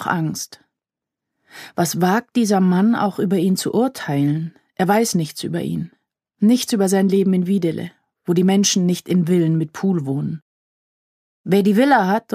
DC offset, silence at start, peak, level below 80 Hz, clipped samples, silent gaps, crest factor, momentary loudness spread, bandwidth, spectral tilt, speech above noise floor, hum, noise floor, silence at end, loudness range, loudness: under 0.1%; 0 s; -2 dBFS; -64 dBFS; under 0.1%; 10.42-11.44 s; 18 dB; 14 LU; 15.5 kHz; -5.5 dB/octave; 68 dB; none; -85 dBFS; 0 s; 2 LU; -18 LUFS